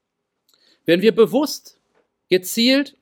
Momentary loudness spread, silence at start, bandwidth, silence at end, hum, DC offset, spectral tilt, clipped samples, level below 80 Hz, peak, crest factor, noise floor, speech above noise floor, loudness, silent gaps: 11 LU; 0.9 s; 18.5 kHz; 0.15 s; none; under 0.1%; -4 dB/octave; under 0.1%; -72 dBFS; -2 dBFS; 18 dB; -70 dBFS; 53 dB; -18 LUFS; none